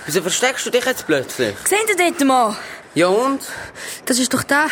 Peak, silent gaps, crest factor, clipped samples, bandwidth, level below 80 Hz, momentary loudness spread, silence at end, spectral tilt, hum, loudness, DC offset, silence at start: -4 dBFS; none; 14 dB; under 0.1%; over 20 kHz; -58 dBFS; 12 LU; 0 s; -2.5 dB/octave; none; -18 LUFS; under 0.1%; 0 s